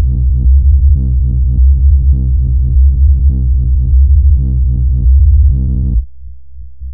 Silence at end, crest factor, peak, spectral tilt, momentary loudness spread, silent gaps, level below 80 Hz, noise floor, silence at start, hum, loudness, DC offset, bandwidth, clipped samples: 0 s; 8 dB; 0 dBFS; -17.5 dB/octave; 5 LU; none; -8 dBFS; -33 dBFS; 0 s; none; -11 LUFS; 4%; 0.6 kHz; under 0.1%